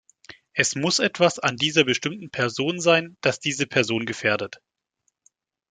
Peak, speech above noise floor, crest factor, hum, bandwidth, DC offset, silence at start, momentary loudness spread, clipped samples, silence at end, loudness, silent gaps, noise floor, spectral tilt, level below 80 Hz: -2 dBFS; 51 dB; 22 dB; none; 9.6 kHz; under 0.1%; 0.55 s; 7 LU; under 0.1%; 1.15 s; -22 LUFS; none; -74 dBFS; -3.5 dB/octave; -66 dBFS